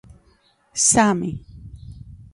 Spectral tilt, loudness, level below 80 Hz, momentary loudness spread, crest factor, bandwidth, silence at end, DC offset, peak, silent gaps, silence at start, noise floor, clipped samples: -3 dB/octave; -18 LUFS; -46 dBFS; 26 LU; 22 dB; 11.5 kHz; 0.1 s; under 0.1%; -2 dBFS; none; 0.75 s; -59 dBFS; under 0.1%